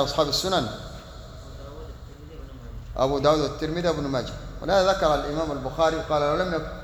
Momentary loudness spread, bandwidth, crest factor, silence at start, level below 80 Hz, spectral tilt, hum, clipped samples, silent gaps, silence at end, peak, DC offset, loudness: 21 LU; over 20 kHz; 20 dB; 0 s; -40 dBFS; -5 dB/octave; none; under 0.1%; none; 0 s; -6 dBFS; under 0.1%; -24 LUFS